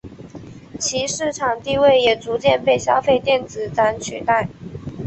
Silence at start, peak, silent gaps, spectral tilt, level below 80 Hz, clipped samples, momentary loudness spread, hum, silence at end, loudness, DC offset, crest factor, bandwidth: 0.05 s; -2 dBFS; none; -3.5 dB/octave; -48 dBFS; under 0.1%; 20 LU; none; 0 s; -18 LUFS; under 0.1%; 16 dB; 8.4 kHz